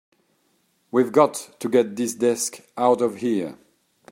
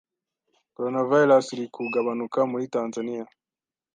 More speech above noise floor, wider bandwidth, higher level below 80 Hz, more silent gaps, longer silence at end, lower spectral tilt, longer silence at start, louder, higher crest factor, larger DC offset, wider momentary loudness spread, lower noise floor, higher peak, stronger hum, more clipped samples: second, 45 dB vs over 66 dB; first, 16 kHz vs 9.4 kHz; first, -72 dBFS vs -80 dBFS; neither; about the same, 0.6 s vs 0.7 s; second, -4.5 dB/octave vs -6 dB/octave; first, 0.95 s vs 0.8 s; about the same, -22 LUFS vs -24 LUFS; about the same, 20 dB vs 18 dB; neither; second, 8 LU vs 14 LU; second, -67 dBFS vs under -90 dBFS; about the same, -4 dBFS vs -6 dBFS; neither; neither